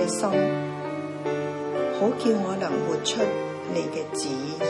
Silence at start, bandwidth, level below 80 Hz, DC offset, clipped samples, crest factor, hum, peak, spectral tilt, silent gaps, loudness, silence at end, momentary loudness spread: 0 s; 11.5 kHz; -70 dBFS; under 0.1%; under 0.1%; 16 dB; 50 Hz at -50 dBFS; -10 dBFS; -4.5 dB/octave; none; -26 LUFS; 0 s; 7 LU